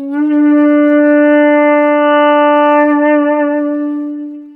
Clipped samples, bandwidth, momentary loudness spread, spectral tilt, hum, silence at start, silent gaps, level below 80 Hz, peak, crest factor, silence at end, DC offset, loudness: under 0.1%; 3.2 kHz; 9 LU; -6 dB/octave; none; 0 s; none; -68 dBFS; 0 dBFS; 10 dB; 0.05 s; under 0.1%; -10 LUFS